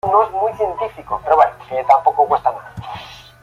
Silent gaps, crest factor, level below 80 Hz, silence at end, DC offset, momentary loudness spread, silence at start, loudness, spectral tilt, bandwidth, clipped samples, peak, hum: none; 16 dB; -50 dBFS; 0.2 s; under 0.1%; 17 LU; 0.05 s; -17 LUFS; -5.5 dB/octave; 11 kHz; under 0.1%; -2 dBFS; none